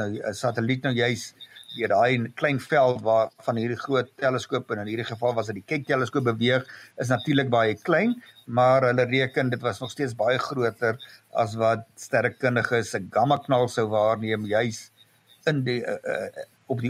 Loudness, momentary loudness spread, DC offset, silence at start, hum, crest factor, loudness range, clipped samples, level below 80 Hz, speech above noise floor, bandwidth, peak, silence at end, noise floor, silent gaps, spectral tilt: -25 LUFS; 9 LU; under 0.1%; 0 s; none; 18 dB; 3 LU; under 0.1%; -68 dBFS; 33 dB; 15 kHz; -8 dBFS; 0 s; -58 dBFS; none; -6 dB/octave